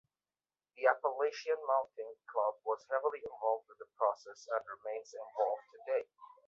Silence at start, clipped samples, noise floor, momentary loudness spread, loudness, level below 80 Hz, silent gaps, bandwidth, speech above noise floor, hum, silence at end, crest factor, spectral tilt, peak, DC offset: 0.8 s; under 0.1%; under -90 dBFS; 12 LU; -37 LUFS; -86 dBFS; none; 7.4 kHz; over 53 dB; none; 0.2 s; 24 dB; 1 dB/octave; -14 dBFS; under 0.1%